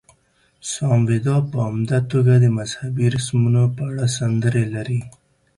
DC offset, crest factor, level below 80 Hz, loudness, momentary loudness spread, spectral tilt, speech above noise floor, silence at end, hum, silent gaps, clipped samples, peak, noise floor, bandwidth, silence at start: under 0.1%; 14 dB; -52 dBFS; -19 LUFS; 9 LU; -6.5 dB/octave; 42 dB; 0.5 s; none; none; under 0.1%; -6 dBFS; -60 dBFS; 11.5 kHz; 0.65 s